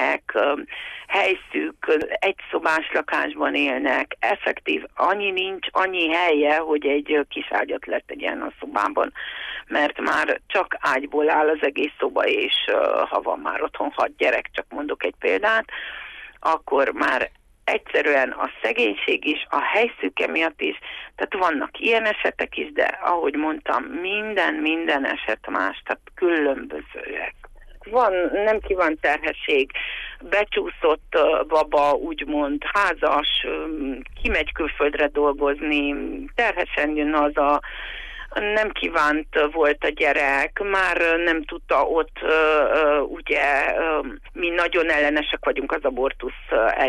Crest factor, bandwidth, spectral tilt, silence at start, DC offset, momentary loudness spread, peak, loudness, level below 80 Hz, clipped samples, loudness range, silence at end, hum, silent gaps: 14 dB; 11.5 kHz; -4 dB/octave; 0 s; under 0.1%; 9 LU; -8 dBFS; -22 LUFS; -44 dBFS; under 0.1%; 3 LU; 0 s; none; none